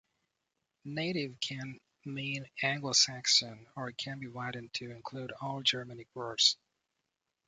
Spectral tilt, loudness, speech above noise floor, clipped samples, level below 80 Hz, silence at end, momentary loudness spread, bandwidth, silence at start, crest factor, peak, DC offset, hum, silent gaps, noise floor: -2 dB/octave; -32 LUFS; 51 dB; under 0.1%; -76 dBFS; 0.95 s; 17 LU; 9.6 kHz; 0.85 s; 26 dB; -10 dBFS; under 0.1%; none; none; -85 dBFS